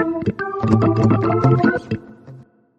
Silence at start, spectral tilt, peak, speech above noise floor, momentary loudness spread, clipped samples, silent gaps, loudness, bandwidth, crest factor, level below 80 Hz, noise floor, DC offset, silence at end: 0 s; -9 dB/octave; -2 dBFS; 27 dB; 10 LU; under 0.1%; none; -17 LUFS; 7.6 kHz; 16 dB; -44 dBFS; -43 dBFS; under 0.1%; 0.35 s